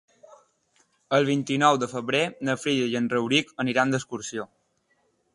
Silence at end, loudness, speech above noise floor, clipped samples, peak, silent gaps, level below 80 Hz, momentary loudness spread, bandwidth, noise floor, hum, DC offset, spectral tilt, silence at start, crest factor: 0.9 s; -25 LUFS; 45 dB; under 0.1%; -6 dBFS; none; -68 dBFS; 11 LU; 11.5 kHz; -70 dBFS; none; under 0.1%; -4.5 dB/octave; 1.1 s; 22 dB